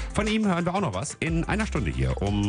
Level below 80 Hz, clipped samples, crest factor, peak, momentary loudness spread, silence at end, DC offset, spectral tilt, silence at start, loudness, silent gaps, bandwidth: -34 dBFS; under 0.1%; 16 dB; -10 dBFS; 4 LU; 0 s; under 0.1%; -5.5 dB/octave; 0 s; -26 LUFS; none; 10.5 kHz